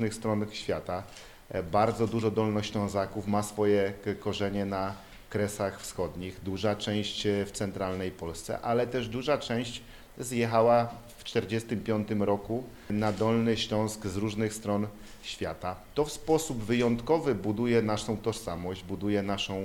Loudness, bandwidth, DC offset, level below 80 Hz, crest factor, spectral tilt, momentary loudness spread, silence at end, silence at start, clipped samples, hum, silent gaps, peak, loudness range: -30 LUFS; 18.5 kHz; under 0.1%; -52 dBFS; 18 dB; -5.5 dB/octave; 10 LU; 0 s; 0 s; under 0.1%; none; none; -12 dBFS; 3 LU